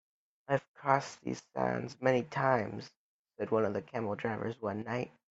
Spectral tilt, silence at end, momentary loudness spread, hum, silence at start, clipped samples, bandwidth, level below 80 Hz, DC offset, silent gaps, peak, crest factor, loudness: -6.5 dB/octave; 0.25 s; 10 LU; none; 0.5 s; under 0.1%; 8 kHz; -72 dBFS; under 0.1%; 0.68-0.74 s, 2.97-3.25 s; -10 dBFS; 24 dB; -34 LUFS